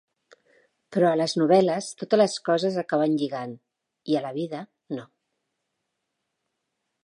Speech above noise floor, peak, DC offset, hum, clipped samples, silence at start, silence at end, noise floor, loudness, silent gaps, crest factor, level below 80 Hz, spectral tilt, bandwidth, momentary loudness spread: 57 dB; -8 dBFS; under 0.1%; none; under 0.1%; 0.9 s; 2 s; -80 dBFS; -24 LUFS; none; 20 dB; -80 dBFS; -5.5 dB/octave; 11.5 kHz; 16 LU